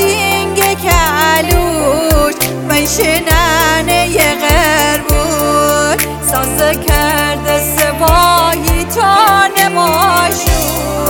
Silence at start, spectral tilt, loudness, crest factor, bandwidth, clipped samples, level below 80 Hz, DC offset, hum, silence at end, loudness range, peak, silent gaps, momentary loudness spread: 0 s; -3.5 dB/octave; -10 LUFS; 10 dB; 19 kHz; under 0.1%; -20 dBFS; under 0.1%; none; 0 s; 1 LU; 0 dBFS; none; 4 LU